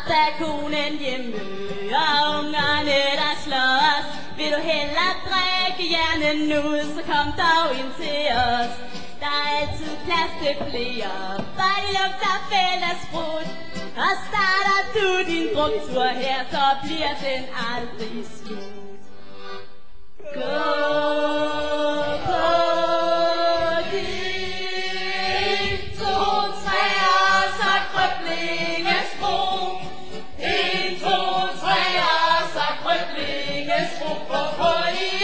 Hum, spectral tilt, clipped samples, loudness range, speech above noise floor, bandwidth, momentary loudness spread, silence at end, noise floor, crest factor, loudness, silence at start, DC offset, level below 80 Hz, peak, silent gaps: none; -3.5 dB/octave; under 0.1%; 5 LU; 27 dB; 8 kHz; 11 LU; 0 s; -50 dBFS; 16 dB; -22 LUFS; 0 s; 4%; -48 dBFS; -6 dBFS; none